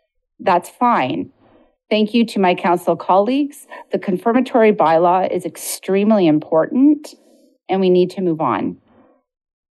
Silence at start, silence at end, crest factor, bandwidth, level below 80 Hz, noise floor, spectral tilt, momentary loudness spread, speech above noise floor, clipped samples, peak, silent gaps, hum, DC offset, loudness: 0.4 s; 0.95 s; 14 dB; 12.5 kHz; -70 dBFS; -53 dBFS; -6 dB/octave; 10 LU; 37 dB; under 0.1%; -2 dBFS; none; none; under 0.1%; -17 LUFS